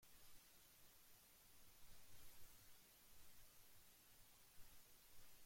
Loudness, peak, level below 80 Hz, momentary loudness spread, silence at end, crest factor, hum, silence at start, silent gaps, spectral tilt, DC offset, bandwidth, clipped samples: -68 LUFS; -48 dBFS; -76 dBFS; 2 LU; 0 s; 14 dB; none; 0 s; none; -1.5 dB/octave; under 0.1%; 16.5 kHz; under 0.1%